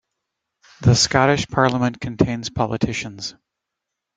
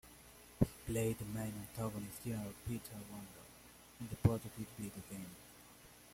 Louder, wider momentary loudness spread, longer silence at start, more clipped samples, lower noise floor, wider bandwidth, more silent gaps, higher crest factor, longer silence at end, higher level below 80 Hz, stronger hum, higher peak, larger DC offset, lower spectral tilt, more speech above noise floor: first, -19 LUFS vs -42 LUFS; second, 12 LU vs 21 LU; first, 0.8 s vs 0.05 s; neither; first, -82 dBFS vs -61 dBFS; second, 9.4 kHz vs 16.5 kHz; neither; second, 20 dB vs 26 dB; first, 0.85 s vs 0 s; first, -44 dBFS vs -58 dBFS; second, none vs 60 Hz at -60 dBFS; first, -2 dBFS vs -16 dBFS; neither; second, -4.5 dB/octave vs -6.5 dB/octave; first, 63 dB vs 19 dB